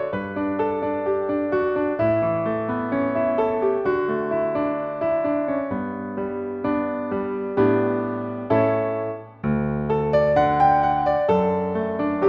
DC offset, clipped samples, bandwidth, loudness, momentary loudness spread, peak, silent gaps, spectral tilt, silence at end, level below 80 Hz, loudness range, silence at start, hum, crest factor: under 0.1%; under 0.1%; 6.4 kHz; -23 LUFS; 8 LU; -8 dBFS; none; -9.5 dB/octave; 0 s; -48 dBFS; 4 LU; 0 s; none; 14 dB